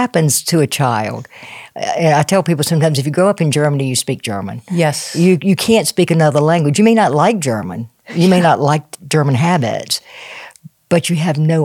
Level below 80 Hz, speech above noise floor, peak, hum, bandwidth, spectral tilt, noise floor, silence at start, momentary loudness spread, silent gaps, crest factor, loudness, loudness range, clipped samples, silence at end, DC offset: -60 dBFS; 25 dB; 0 dBFS; none; 16.5 kHz; -5.5 dB/octave; -39 dBFS; 0 s; 13 LU; none; 14 dB; -14 LUFS; 3 LU; under 0.1%; 0 s; under 0.1%